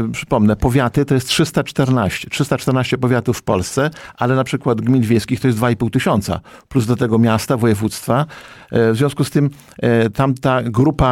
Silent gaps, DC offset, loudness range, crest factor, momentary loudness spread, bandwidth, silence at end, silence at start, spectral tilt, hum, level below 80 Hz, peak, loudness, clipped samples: none; under 0.1%; 1 LU; 12 dB; 6 LU; 16 kHz; 0 s; 0 s; -6 dB/octave; none; -36 dBFS; -4 dBFS; -17 LUFS; under 0.1%